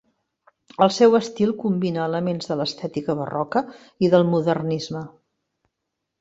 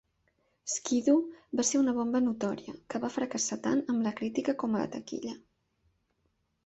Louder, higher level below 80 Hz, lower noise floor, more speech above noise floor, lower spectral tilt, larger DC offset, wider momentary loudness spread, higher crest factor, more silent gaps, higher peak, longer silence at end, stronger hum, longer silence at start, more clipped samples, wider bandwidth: first, -22 LUFS vs -31 LUFS; first, -62 dBFS vs -70 dBFS; first, -80 dBFS vs -76 dBFS; first, 60 dB vs 46 dB; first, -6.5 dB/octave vs -4 dB/octave; neither; about the same, 13 LU vs 12 LU; about the same, 20 dB vs 18 dB; neither; first, -2 dBFS vs -14 dBFS; second, 1.1 s vs 1.25 s; neither; first, 0.8 s vs 0.65 s; neither; about the same, 8 kHz vs 8.2 kHz